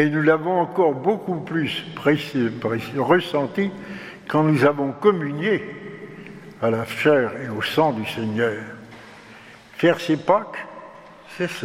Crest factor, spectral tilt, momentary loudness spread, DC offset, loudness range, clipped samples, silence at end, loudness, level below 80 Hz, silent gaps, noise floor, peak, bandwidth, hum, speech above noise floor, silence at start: 20 dB; -6.5 dB/octave; 19 LU; under 0.1%; 3 LU; under 0.1%; 0 s; -21 LUFS; -64 dBFS; none; -45 dBFS; -2 dBFS; 15.5 kHz; none; 24 dB; 0 s